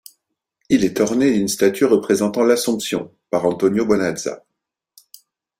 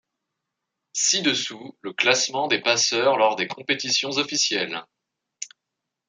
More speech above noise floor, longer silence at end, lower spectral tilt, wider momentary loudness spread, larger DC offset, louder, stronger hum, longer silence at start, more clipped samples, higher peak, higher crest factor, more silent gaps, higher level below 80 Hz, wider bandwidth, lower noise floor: about the same, 57 dB vs 60 dB; first, 1.2 s vs 0.6 s; first, -4.5 dB/octave vs -1 dB/octave; second, 8 LU vs 16 LU; neither; first, -18 LUFS vs -21 LUFS; neither; second, 0.7 s vs 0.95 s; neither; about the same, -2 dBFS vs -2 dBFS; second, 16 dB vs 22 dB; neither; first, -56 dBFS vs -76 dBFS; first, 16 kHz vs 11 kHz; second, -75 dBFS vs -83 dBFS